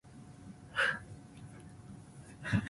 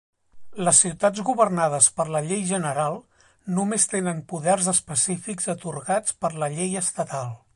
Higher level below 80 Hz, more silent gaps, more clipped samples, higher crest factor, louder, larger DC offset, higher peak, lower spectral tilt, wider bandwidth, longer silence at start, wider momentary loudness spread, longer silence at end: first, -58 dBFS vs -64 dBFS; neither; neither; about the same, 22 dB vs 22 dB; second, -35 LUFS vs -22 LUFS; neither; second, -18 dBFS vs -2 dBFS; first, -5 dB/octave vs -3.5 dB/octave; about the same, 11.5 kHz vs 11.5 kHz; second, 0.05 s vs 0.35 s; first, 20 LU vs 11 LU; second, 0 s vs 0.2 s